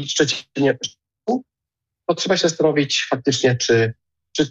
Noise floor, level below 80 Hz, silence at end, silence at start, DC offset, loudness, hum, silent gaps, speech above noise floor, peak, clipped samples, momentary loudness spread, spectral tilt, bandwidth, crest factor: -84 dBFS; -58 dBFS; 0 s; 0 s; under 0.1%; -20 LUFS; none; none; 66 dB; -6 dBFS; under 0.1%; 10 LU; -4 dB/octave; 8.4 kHz; 14 dB